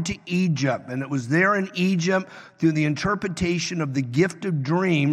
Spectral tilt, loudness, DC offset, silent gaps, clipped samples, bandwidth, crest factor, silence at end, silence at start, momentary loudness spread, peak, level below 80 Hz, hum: -6 dB/octave; -23 LUFS; under 0.1%; none; under 0.1%; 11.5 kHz; 16 dB; 0 s; 0 s; 6 LU; -6 dBFS; -54 dBFS; none